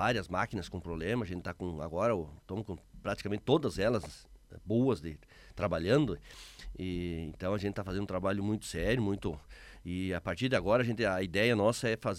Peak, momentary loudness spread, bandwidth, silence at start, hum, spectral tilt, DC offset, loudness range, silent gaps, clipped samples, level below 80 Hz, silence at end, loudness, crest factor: -14 dBFS; 16 LU; 15.5 kHz; 0 s; none; -6 dB/octave; under 0.1%; 3 LU; none; under 0.1%; -52 dBFS; 0 s; -33 LUFS; 18 dB